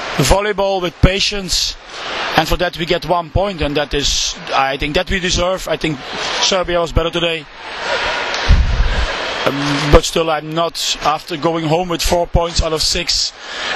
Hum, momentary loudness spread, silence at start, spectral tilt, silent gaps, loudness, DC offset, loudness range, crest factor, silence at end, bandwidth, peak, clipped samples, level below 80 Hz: none; 6 LU; 0 s; -3.5 dB/octave; none; -16 LUFS; under 0.1%; 1 LU; 16 dB; 0 s; 13.5 kHz; 0 dBFS; 0.1%; -24 dBFS